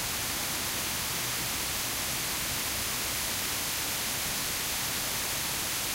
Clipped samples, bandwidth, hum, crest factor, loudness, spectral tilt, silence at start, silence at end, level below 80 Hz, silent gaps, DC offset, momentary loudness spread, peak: under 0.1%; 16 kHz; none; 14 dB; -29 LUFS; -1 dB/octave; 0 s; 0 s; -50 dBFS; none; under 0.1%; 0 LU; -18 dBFS